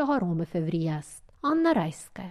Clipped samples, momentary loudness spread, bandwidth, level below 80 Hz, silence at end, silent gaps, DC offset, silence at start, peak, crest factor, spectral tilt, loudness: under 0.1%; 13 LU; 12.5 kHz; -58 dBFS; 0 s; none; under 0.1%; 0 s; -14 dBFS; 14 dB; -7 dB/octave; -28 LUFS